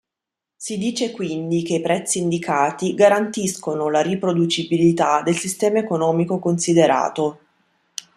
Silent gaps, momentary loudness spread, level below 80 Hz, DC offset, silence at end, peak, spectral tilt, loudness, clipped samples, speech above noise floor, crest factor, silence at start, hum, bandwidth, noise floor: none; 9 LU; -62 dBFS; under 0.1%; 0.8 s; -2 dBFS; -5 dB/octave; -20 LUFS; under 0.1%; 66 dB; 18 dB; 0.6 s; none; 13.5 kHz; -85 dBFS